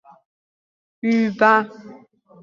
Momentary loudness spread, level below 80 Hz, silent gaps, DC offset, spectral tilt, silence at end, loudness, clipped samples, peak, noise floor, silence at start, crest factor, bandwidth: 12 LU; -68 dBFS; none; under 0.1%; -6.5 dB/octave; 0.5 s; -18 LUFS; under 0.1%; -2 dBFS; -48 dBFS; 1.05 s; 20 dB; 7.2 kHz